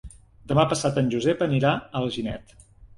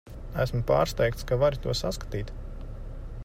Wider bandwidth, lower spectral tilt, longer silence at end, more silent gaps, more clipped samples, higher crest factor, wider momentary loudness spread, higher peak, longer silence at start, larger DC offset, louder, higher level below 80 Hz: second, 11.5 kHz vs 16 kHz; about the same, -6 dB/octave vs -5.5 dB/octave; about the same, 0.1 s vs 0 s; neither; neither; about the same, 20 dB vs 18 dB; second, 9 LU vs 17 LU; first, -4 dBFS vs -10 dBFS; about the same, 0.05 s vs 0.05 s; neither; first, -24 LUFS vs -28 LUFS; second, -50 dBFS vs -38 dBFS